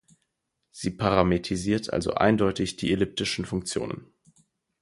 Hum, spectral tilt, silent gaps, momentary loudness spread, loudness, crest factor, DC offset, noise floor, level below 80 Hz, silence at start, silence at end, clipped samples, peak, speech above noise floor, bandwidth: none; -5.5 dB/octave; none; 11 LU; -26 LUFS; 22 dB; under 0.1%; -79 dBFS; -48 dBFS; 0.75 s; 0.75 s; under 0.1%; -4 dBFS; 53 dB; 11.5 kHz